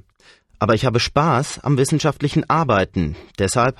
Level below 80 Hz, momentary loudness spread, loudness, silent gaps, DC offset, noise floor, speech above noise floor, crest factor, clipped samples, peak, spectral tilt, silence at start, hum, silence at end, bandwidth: -40 dBFS; 7 LU; -19 LUFS; none; under 0.1%; -53 dBFS; 35 dB; 16 dB; under 0.1%; -4 dBFS; -5.5 dB/octave; 0.6 s; none; 0.05 s; 13 kHz